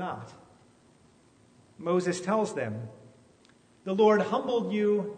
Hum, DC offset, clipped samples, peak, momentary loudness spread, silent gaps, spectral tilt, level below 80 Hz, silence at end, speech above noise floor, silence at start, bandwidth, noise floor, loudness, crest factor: none; under 0.1%; under 0.1%; -10 dBFS; 19 LU; none; -6 dB/octave; -74 dBFS; 0 s; 33 dB; 0 s; 9.6 kHz; -61 dBFS; -28 LUFS; 18 dB